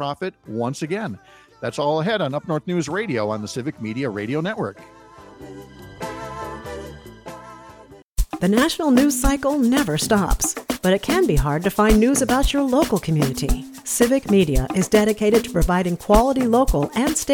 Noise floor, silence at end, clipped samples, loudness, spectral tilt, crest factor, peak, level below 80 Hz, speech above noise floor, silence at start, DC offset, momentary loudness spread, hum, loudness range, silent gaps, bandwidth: -45 dBFS; 0 s; under 0.1%; -20 LUFS; -5 dB/octave; 18 dB; -2 dBFS; -30 dBFS; 26 dB; 0 s; under 0.1%; 16 LU; none; 12 LU; 8.03-8.15 s; 19.5 kHz